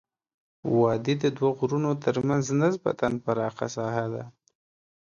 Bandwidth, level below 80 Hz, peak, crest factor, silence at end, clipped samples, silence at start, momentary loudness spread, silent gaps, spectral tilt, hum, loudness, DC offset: 7.4 kHz; -62 dBFS; -10 dBFS; 18 dB; 0.75 s; under 0.1%; 0.65 s; 8 LU; none; -6.5 dB/octave; none; -26 LUFS; under 0.1%